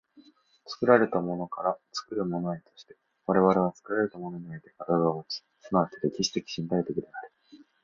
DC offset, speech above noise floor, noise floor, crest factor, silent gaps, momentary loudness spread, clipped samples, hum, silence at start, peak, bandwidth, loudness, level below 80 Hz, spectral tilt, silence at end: under 0.1%; 30 dB; -59 dBFS; 22 dB; none; 18 LU; under 0.1%; none; 0.65 s; -6 dBFS; 7.6 kHz; -28 LUFS; -66 dBFS; -5.5 dB/octave; 0.25 s